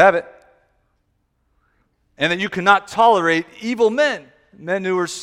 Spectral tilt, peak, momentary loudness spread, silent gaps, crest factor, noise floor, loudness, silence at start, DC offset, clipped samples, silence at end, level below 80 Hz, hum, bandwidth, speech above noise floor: -4 dB/octave; 0 dBFS; 11 LU; none; 20 dB; -67 dBFS; -18 LUFS; 0 s; under 0.1%; under 0.1%; 0 s; -60 dBFS; none; 14 kHz; 50 dB